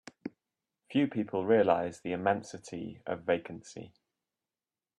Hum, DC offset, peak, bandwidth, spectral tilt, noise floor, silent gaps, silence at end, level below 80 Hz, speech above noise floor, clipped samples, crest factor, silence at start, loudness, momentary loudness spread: none; under 0.1%; -12 dBFS; 10.5 kHz; -6 dB/octave; under -90 dBFS; none; 1.1 s; -74 dBFS; over 59 dB; under 0.1%; 20 dB; 0.25 s; -31 LUFS; 20 LU